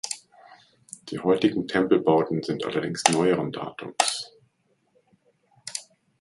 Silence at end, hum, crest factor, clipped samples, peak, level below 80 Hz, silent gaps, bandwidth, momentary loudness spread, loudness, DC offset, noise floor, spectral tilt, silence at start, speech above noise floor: 0.4 s; none; 26 dB; under 0.1%; 0 dBFS; -66 dBFS; none; 11.5 kHz; 16 LU; -25 LUFS; under 0.1%; -69 dBFS; -4 dB/octave; 0.05 s; 45 dB